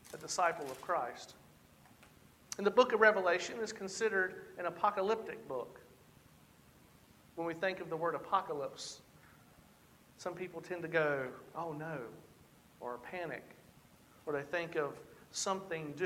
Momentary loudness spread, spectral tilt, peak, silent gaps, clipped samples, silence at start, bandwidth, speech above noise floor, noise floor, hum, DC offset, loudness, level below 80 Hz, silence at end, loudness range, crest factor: 15 LU; -3.5 dB/octave; -12 dBFS; none; under 0.1%; 0.05 s; 16.5 kHz; 27 dB; -64 dBFS; none; under 0.1%; -36 LUFS; -74 dBFS; 0 s; 10 LU; 26 dB